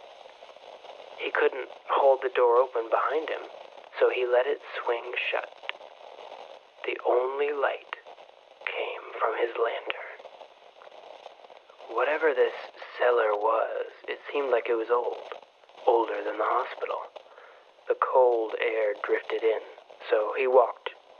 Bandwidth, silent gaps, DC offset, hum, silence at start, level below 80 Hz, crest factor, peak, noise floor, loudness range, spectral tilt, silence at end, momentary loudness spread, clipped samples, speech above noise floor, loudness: 6.6 kHz; none; under 0.1%; none; 0.05 s; -90 dBFS; 20 dB; -8 dBFS; -53 dBFS; 6 LU; -3 dB/octave; 0.25 s; 23 LU; under 0.1%; 26 dB; -27 LUFS